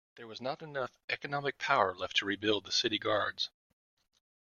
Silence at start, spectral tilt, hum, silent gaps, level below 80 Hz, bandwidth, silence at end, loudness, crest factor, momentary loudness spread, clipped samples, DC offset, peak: 0.15 s; -3 dB/octave; none; 1.04-1.08 s; -74 dBFS; 7.4 kHz; 1 s; -33 LUFS; 24 dB; 10 LU; under 0.1%; under 0.1%; -12 dBFS